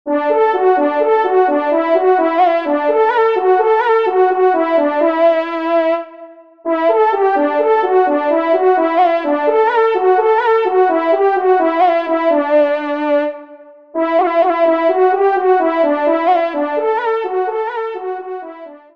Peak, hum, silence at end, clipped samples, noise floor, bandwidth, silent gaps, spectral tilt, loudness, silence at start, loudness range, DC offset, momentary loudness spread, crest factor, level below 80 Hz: -2 dBFS; none; 0.2 s; under 0.1%; -39 dBFS; 5.8 kHz; none; -5 dB/octave; -14 LUFS; 0.05 s; 2 LU; 0.3%; 7 LU; 12 dB; -68 dBFS